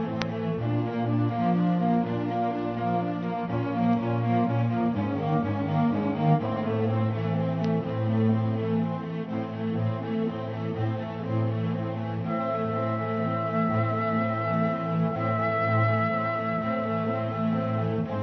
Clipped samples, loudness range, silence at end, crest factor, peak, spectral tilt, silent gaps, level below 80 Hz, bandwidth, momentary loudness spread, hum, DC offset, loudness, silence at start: under 0.1%; 3 LU; 0 s; 22 dB; -6 dBFS; -9.5 dB/octave; none; -60 dBFS; 6.2 kHz; 6 LU; none; under 0.1%; -27 LUFS; 0 s